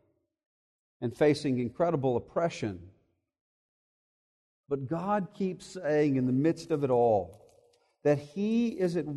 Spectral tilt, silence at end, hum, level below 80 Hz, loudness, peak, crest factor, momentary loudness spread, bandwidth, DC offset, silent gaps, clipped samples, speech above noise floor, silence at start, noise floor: -7.5 dB/octave; 0 s; none; -66 dBFS; -30 LUFS; -14 dBFS; 16 dB; 11 LU; 12 kHz; under 0.1%; 3.41-4.64 s; under 0.1%; 37 dB; 1 s; -66 dBFS